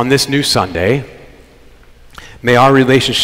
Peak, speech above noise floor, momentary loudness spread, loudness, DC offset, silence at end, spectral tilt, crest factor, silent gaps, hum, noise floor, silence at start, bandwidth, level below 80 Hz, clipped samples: 0 dBFS; 30 dB; 11 LU; -12 LUFS; under 0.1%; 0 s; -4.5 dB/octave; 14 dB; none; none; -41 dBFS; 0 s; 16 kHz; -40 dBFS; under 0.1%